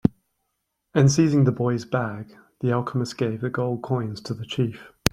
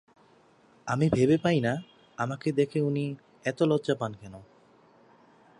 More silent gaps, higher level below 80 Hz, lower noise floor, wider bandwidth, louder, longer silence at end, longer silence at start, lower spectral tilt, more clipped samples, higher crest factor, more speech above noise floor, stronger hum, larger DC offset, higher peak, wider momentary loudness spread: neither; first, -50 dBFS vs -60 dBFS; first, -77 dBFS vs -60 dBFS; first, 16.5 kHz vs 11 kHz; first, -24 LUFS vs -28 LUFS; second, 0.25 s vs 1.15 s; second, 0.05 s vs 0.85 s; about the same, -6 dB/octave vs -7 dB/octave; neither; about the same, 24 dB vs 20 dB; first, 54 dB vs 34 dB; neither; neither; first, 0 dBFS vs -10 dBFS; second, 12 LU vs 15 LU